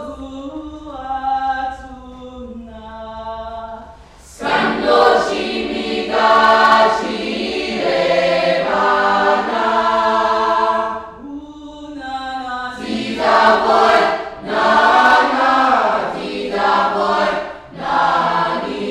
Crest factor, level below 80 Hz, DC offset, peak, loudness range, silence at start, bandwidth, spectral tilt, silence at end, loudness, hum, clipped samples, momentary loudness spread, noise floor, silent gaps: 14 dB; -46 dBFS; under 0.1%; -2 dBFS; 12 LU; 0 s; 12.5 kHz; -4 dB/octave; 0 s; -15 LUFS; none; under 0.1%; 20 LU; -40 dBFS; none